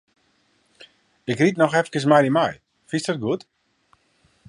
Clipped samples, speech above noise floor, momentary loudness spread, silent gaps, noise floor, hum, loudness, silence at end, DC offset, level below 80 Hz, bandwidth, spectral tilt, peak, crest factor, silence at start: under 0.1%; 45 dB; 12 LU; none; -64 dBFS; none; -21 LUFS; 1.1 s; under 0.1%; -66 dBFS; 11 kHz; -6 dB/octave; -2 dBFS; 22 dB; 1.25 s